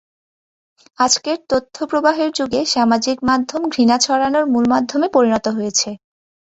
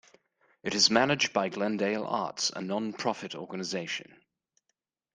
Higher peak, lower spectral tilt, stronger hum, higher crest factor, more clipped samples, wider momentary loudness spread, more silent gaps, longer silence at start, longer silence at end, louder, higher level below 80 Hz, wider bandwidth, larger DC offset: first, 0 dBFS vs -6 dBFS; about the same, -3 dB/octave vs -3 dB/octave; neither; second, 16 dB vs 24 dB; neither; second, 5 LU vs 14 LU; neither; first, 1 s vs 0.65 s; second, 0.55 s vs 1.15 s; first, -17 LUFS vs -29 LUFS; first, -54 dBFS vs -72 dBFS; second, 8.2 kHz vs 10.5 kHz; neither